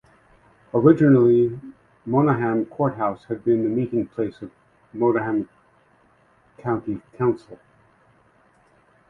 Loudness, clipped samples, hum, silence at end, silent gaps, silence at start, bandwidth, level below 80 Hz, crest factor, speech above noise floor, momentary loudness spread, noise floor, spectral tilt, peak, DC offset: -21 LUFS; under 0.1%; none; 1.55 s; none; 0.75 s; 4.4 kHz; -60 dBFS; 20 dB; 38 dB; 18 LU; -59 dBFS; -11 dB/octave; -2 dBFS; under 0.1%